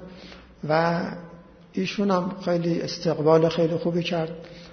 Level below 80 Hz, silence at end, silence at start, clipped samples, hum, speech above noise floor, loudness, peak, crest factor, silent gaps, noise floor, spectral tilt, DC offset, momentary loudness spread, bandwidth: -58 dBFS; 0 s; 0 s; under 0.1%; none; 21 dB; -24 LUFS; -6 dBFS; 20 dB; none; -45 dBFS; -6.5 dB/octave; under 0.1%; 20 LU; 6.6 kHz